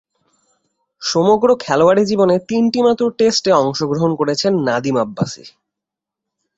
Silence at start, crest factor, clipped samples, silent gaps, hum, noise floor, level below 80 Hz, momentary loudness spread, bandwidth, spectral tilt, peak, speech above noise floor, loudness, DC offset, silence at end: 1 s; 16 dB; under 0.1%; none; none; -84 dBFS; -56 dBFS; 7 LU; 8 kHz; -5 dB/octave; -2 dBFS; 69 dB; -15 LUFS; under 0.1%; 1.1 s